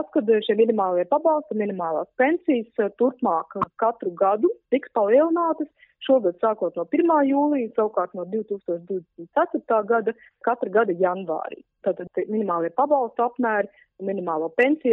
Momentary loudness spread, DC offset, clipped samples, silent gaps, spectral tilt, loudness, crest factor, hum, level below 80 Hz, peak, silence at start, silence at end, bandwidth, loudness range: 10 LU; under 0.1%; under 0.1%; none; -4.5 dB/octave; -23 LUFS; 16 dB; none; -74 dBFS; -8 dBFS; 0 s; 0 s; 4 kHz; 3 LU